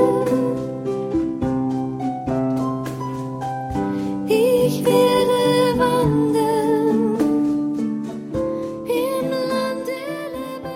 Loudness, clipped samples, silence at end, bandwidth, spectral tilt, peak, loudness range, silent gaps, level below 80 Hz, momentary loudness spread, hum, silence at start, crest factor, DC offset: -21 LUFS; under 0.1%; 0 s; 16.5 kHz; -6.5 dB/octave; -4 dBFS; 6 LU; none; -46 dBFS; 10 LU; none; 0 s; 16 dB; under 0.1%